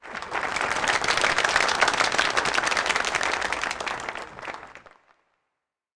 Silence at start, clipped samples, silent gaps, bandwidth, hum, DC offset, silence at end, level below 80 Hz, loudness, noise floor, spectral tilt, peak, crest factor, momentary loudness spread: 0 s; under 0.1%; none; 10.5 kHz; none; under 0.1%; 1.2 s; -54 dBFS; -23 LUFS; -83 dBFS; -1 dB/octave; -8 dBFS; 20 dB; 14 LU